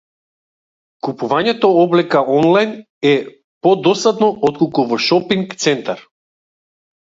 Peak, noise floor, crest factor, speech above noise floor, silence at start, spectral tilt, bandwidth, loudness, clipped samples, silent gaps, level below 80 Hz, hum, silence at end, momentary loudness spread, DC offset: 0 dBFS; under -90 dBFS; 16 dB; over 76 dB; 1.05 s; -5 dB/octave; 7.8 kHz; -15 LUFS; under 0.1%; 2.90-3.01 s, 3.44-3.61 s; -62 dBFS; none; 1 s; 10 LU; under 0.1%